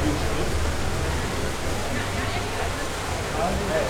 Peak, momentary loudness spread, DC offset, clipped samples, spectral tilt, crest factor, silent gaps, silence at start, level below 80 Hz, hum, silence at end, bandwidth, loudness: -10 dBFS; 3 LU; under 0.1%; under 0.1%; -4.5 dB/octave; 16 dB; none; 0 s; -32 dBFS; none; 0 s; 17.5 kHz; -27 LUFS